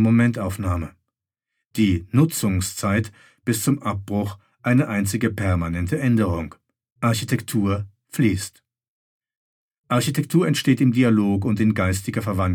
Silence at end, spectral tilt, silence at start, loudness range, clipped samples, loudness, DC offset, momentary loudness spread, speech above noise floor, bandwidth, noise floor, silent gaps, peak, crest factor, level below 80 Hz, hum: 0 s; -6 dB/octave; 0 s; 4 LU; under 0.1%; -22 LUFS; under 0.1%; 10 LU; 62 dB; 18 kHz; -83 dBFS; 6.92-6.96 s, 8.88-9.20 s, 9.37-9.69 s, 9.78-9.84 s; -4 dBFS; 16 dB; -48 dBFS; none